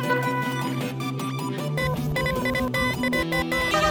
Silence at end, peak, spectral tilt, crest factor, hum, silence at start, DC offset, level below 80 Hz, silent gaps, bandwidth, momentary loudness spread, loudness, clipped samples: 0 s; -8 dBFS; -5 dB/octave; 16 dB; none; 0 s; under 0.1%; -42 dBFS; none; over 20 kHz; 6 LU; -25 LUFS; under 0.1%